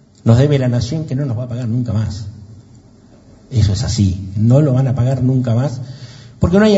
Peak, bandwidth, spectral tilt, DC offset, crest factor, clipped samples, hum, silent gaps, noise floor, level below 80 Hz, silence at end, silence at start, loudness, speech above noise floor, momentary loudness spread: 0 dBFS; 8 kHz; -7.5 dB/octave; under 0.1%; 16 dB; under 0.1%; none; none; -44 dBFS; -36 dBFS; 0 s; 0.25 s; -16 LUFS; 30 dB; 15 LU